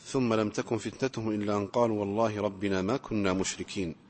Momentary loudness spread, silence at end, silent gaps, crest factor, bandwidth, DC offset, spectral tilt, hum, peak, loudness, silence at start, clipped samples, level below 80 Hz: 5 LU; 0.15 s; none; 18 dB; 8.8 kHz; under 0.1%; -5.5 dB/octave; none; -12 dBFS; -30 LUFS; 0 s; under 0.1%; -58 dBFS